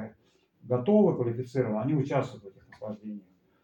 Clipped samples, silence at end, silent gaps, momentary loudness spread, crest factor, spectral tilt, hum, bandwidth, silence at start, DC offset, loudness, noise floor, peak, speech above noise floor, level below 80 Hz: under 0.1%; 0.45 s; none; 21 LU; 18 dB; -9 dB/octave; none; 7.8 kHz; 0 s; under 0.1%; -28 LUFS; -66 dBFS; -12 dBFS; 38 dB; -70 dBFS